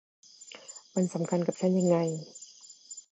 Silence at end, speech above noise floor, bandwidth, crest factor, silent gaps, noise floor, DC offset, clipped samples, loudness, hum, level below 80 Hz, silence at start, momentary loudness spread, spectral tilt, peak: 0.1 s; 24 dB; 9 kHz; 18 dB; none; -52 dBFS; under 0.1%; under 0.1%; -29 LUFS; none; -80 dBFS; 0.4 s; 22 LU; -6.5 dB/octave; -12 dBFS